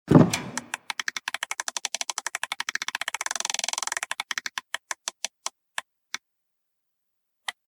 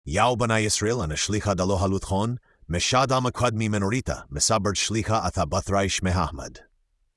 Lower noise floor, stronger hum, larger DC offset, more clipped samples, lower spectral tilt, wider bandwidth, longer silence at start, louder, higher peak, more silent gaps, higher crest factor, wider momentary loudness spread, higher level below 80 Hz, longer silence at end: first, -79 dBFS vs -67 dBFS; neither; neither; neither; about the same, -3.5 dB/octave vs -4 dB/octave; first, 18 kHz vs 12 kHz; about the same, 0.05 s vs 0.05 s; second, -29 LUFS vs -24 LUFS; first, -2 dBFS vs -6 dBFS; neither; first, 26 dB vs 18 dB; first, 11 LU vs 8 LU; second, -58 dBFS vs -44 dBFS; second, 0.2 s vs 0.55 s